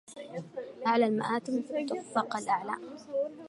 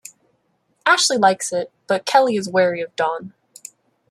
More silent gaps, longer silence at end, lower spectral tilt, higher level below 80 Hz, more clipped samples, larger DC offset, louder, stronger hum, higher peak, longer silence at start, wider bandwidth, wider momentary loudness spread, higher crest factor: neither; second, 0 s vs 0.8 s; first, -5 dB/octave vs -2.5 dB/octave; second, -82 dBFS vs -70 dBFS; neither; neither; second, -32 LUFS vs -18 LUFS; neither; second, -14 dBFS vs -2 dBFS; second, 0.1 s vs 0.85 s; second, 11.5 kHz vs 13.5 kHz; second, 14 LU vs 17 LU; about the same, 18 dB vs 20 dB